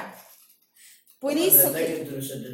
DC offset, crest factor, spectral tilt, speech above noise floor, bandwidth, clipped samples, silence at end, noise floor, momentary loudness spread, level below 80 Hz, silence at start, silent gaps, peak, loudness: under 0.1%; 20 dB; -3 dB/octave; 34 dB; 17 kHz; under 0.1%; 0 s; -57 dBFS; 17 LU; -68 dBFS; 0 s; none; -4 dBFS; -20 LUFS